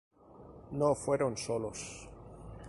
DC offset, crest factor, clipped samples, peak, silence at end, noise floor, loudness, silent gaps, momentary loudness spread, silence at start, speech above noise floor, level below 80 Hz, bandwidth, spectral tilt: under 0.1%; 20 dB; under 0.1%; -16 dBFS; 0 s; -54 dBFS; -34 LUFS; none; 20 LU; 0.25 s; 21 dB; -58 dBFS; 11.5 kHz; -5 dB/octave